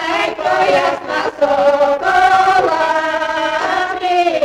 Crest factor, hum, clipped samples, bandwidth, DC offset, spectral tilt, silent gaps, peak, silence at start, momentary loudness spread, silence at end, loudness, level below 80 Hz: 12 dB; none; under 0.1%; 13 kHz; under 0.1%; -3.5 dB/octave; none; -2 dBFS; 0 s; 6 LU; 0 s; -14 LUFS; -50 dBFS